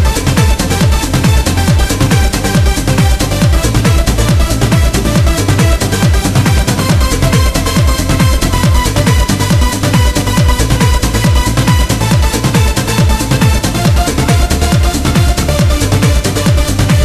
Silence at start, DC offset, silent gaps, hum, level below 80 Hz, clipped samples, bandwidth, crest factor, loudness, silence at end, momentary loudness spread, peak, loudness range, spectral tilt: 0 s; under 0.1%; none; none; -14 dBFS; under 0.1%; 14.5 kHz; 10 dB; -11 LUFS; 0 s; 1 LU; 0 dBFS; 0 LU; -5 dB/octave